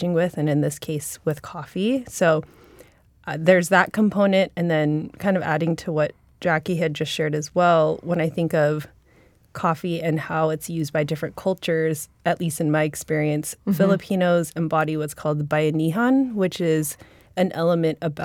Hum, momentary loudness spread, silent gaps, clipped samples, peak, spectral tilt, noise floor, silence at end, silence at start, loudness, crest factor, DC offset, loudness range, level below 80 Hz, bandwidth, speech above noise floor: none; 8 LU; none; under 0.1%; -2 dBFS; -6 dB/octave; -56 dBFS; 0 s; 0 s; -22 LUFS; 20 dB; under 0.1%; 4 LU; -58 dBFS; 17.5 kHz; 34 dB